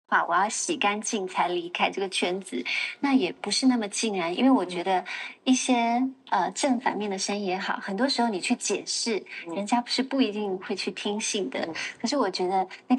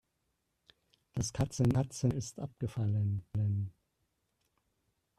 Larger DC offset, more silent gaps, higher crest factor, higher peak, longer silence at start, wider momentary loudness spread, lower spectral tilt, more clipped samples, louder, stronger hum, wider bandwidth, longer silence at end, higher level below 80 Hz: neither; neither; about the same, 18 dB vs 18 dB; first, -8 dBFS vs -18 dBFS; second, 0.1 s vs 1.15 s; second, 7 LU vs 10 LU; second, -3 dB/octave vs -6.5 dB/octave; neither; first, -26 LUFS vs -35 LUFS; neither; second, 11.5 kHz vs 13 kHz; second, 0 s vs 1.5 s; second, -84 dBFS vs -58 dBFS